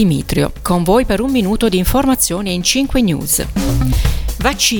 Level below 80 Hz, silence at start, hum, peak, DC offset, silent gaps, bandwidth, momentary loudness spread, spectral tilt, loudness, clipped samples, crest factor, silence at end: -22 dBFS; 0 s; none; 0 dBFS; under 0.1%; none; 19.5 kHz; 4 LU; -4.5 dB/octave; -15 LUFS; under 0.1%; 14 dB; 0 s